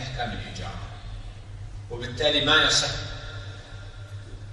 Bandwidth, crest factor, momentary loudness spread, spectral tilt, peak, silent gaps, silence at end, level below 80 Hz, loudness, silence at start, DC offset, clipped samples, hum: 11.5 kHz; 22 dB; 23 LU; -2.5 dB/octave; -6 dBFS; none; 0 s; -42 dBFS; -23 LUFS; 0 s; under 0.1%; under 0.1%; none